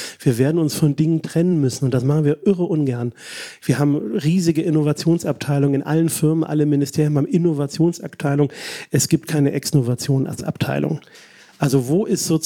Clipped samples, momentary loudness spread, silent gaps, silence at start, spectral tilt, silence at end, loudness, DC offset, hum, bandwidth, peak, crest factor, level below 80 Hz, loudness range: under 0.1%; 5 LU; none; 0 s; -6.5 dB/octave; 0 s; -19 LUFS; under 0.1%; none; 17.5 kHz; -4 dBFS; 14 dB; -60 dBFS; 2 LU